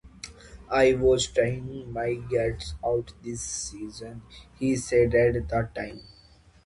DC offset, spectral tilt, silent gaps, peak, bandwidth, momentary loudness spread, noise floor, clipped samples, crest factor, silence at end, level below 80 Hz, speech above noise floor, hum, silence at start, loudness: under 0.1%; -5 dB/octave; none; -10 dBFS; 11.5 kHz; 20 LU; -56 dBFS; under 0.1%; 18 dB; 0.6 s; -44 dBFS; 30 dB; none; 0.05 s; -26 LUFS